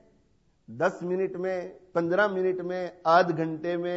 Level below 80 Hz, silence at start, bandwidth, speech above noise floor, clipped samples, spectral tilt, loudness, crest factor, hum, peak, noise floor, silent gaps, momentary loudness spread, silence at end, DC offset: -70 dBFS; 0.7 s; 8 kHz; 39 dB; under 0.1%; -7 dB/octave; -27 LUFS; 20 dB; none; -8 dBFS; -66 dBFS; none; 10 LU; 0 s; under 0.1%